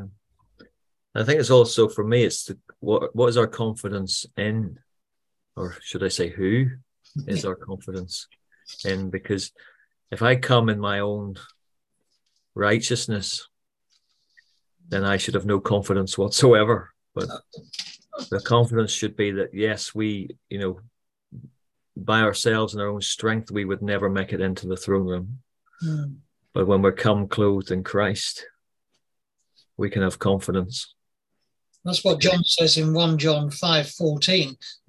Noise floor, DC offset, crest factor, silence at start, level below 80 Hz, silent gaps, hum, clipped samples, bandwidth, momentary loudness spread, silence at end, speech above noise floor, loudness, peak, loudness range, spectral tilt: -83 dBFS; under 0.1%; 22 dB; 0 s; -50 dBFS; none; none; under 0.1%; 12.5 kHz; 16 LU; 0.15 s; 60 dB; -23 LUFS; -4 dBFS; 7 LU; -5 dB/octave